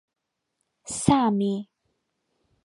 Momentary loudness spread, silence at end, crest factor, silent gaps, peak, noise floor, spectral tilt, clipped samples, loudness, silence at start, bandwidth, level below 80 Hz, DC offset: 13 LU; 1.05 s; 24 dB; none; -4 dBFS; -79 dBFS; -5.5 dB/octave; under 0.1%; -24 LUFS; 0.85 s; 11.5 kHz; -54 dBFS; under 0.1%